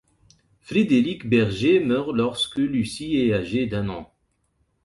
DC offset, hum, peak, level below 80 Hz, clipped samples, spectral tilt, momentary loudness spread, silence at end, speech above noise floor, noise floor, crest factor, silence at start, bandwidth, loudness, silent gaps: under 0.1%; none; -8 dBFS; -50 dBFS; under 0.1%; -6 dB/octave; 7 LU; 0.8 s; 47 dB; -69 dBFS; 16 dB; 0.7 s; 11.5 kHz; -22 LUFS; none